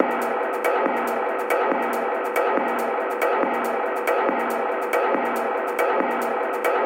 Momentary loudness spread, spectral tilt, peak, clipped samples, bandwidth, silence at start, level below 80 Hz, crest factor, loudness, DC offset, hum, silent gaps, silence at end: 3 LU; -3.5 dB/octave; -2 dBFS; under 0.1%; 17 kHz; 0 s; -76 dBFS; 20 dB; -23 LUFS; under 0.1%; none; none; 0 s